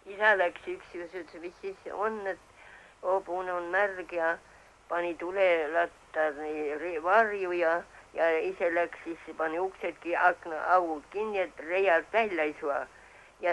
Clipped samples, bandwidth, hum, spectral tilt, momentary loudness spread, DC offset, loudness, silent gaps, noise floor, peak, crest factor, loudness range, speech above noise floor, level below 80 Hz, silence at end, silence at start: under 0.1%; 11.5 kHz; none; -4.5 dB/octave; 15 LU; under 0.1%; -30 LUFS; none; -53 dBFS; -10 dBFS; 20 dB; 4 LU; 24 dB; -66 dBFS; 0 s; 0.05 s